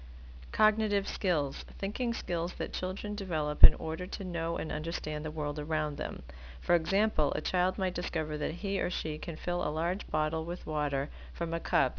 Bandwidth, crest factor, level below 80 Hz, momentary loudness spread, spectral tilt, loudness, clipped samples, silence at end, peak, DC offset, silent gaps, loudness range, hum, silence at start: 5.4 kHz; 28 dB; -32 dBFS; 10 LU; -6.5 dB/octave; -32 LUFS; under 0.1%; 0 s; 0 dBFS; under 0.1%; none; 3 LU; none; 0 s